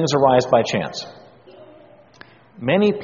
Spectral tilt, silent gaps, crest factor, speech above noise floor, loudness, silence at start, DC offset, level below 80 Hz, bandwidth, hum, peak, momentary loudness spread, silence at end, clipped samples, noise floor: -4.5 dB/octave; none; 18 dB; 30 dB; -18 LUFS; 0 s; under 0.1%; -56 dBFS; 7.4 kHz; none; -2 dBFS; 16 LU; 0 s; under 0.1%; -48 dBFS